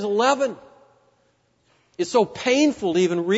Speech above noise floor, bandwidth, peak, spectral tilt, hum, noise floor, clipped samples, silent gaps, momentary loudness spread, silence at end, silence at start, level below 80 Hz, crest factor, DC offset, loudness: 44 dB; 8 kHz; -6 dBFS; -4.5 dB/octave; none; -65 dBFS; under 0.1%; none; 8 LU; 0 s; 0 s; -64 dBFS; 16 dB; under 0.1%; -21 LUFS